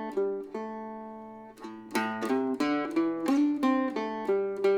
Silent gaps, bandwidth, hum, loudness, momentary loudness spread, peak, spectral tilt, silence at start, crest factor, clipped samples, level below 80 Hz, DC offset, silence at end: none; 17 kHz; none; -30 LUFS; 18 LU; -14 dBFS; -5.5 dB/octave; 0 s; 16 dB; under 0.1%; -74 dBFS; under 0.1%; 0 s